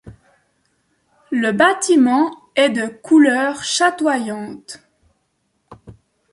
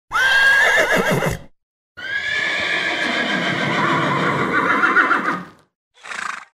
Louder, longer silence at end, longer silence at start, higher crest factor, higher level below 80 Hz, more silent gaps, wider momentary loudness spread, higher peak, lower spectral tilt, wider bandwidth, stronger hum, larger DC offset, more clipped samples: about the same, -16 LUFS vs -17 LUFS; first, 0.4 s vs 0.15 s; about the same, 0.05 s vs 0.1 s; about the same, 16 dB vs 16 dB; second, -60 dBFS vs -48 dBFS; second, none vs 1.63-1.95 s, 5.75-5.91 s; first, 17 LU vs 14 LU; about the same, -2 dBFS vs -4 dBFS; about the same, -3.5 dB/octave vs -3.5 dB/octave; second, 11.5 kHz vs 16 kHz; neither; neither; neither